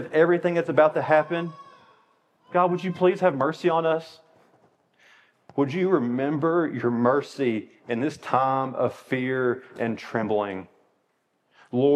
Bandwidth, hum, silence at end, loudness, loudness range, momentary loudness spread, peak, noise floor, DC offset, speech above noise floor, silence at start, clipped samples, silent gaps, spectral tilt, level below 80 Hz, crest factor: 9.6 kHz; none; 0 s; -24 LUFS; 3 LU; 9 LU; -4 dBFS; -71 dBFS; under 0.1%; 48 dB; 0 s; under 0.1%; none; -7.5 dB/octave; -80 dBFS; 20 dB